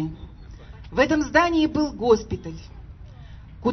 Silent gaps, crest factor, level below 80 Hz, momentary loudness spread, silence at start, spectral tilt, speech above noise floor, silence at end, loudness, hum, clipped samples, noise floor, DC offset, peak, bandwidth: none; 22 dB; -42 dBFS; 25 LU; 0 s; -5.5 dB/octave; 20 dB; 0 s; -22 LUFS; none; under 0.1%; -42 dBFS; under 0.1%; -2 dBFS; 6.4 kHz